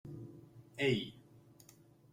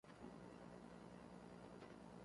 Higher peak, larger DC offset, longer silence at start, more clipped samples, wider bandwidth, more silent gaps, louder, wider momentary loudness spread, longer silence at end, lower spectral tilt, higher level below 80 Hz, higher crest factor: first, -20 dBFS vs -44 dBFS; neither; about the same, 0.05 s vs 0.05 s; neither; first, 16 kHz vs 11.5 kHz; neither; first, -37 LUFS vs -60 LUFS; first, 26 LU vs 1 LU; first, 0.75 s vs 0 s; about the same, -5.5 dB/octave vs -6.5 dB/octave; about the same, -72 dBFS vs -76 dBFS; first, 22 dB vs 16 dB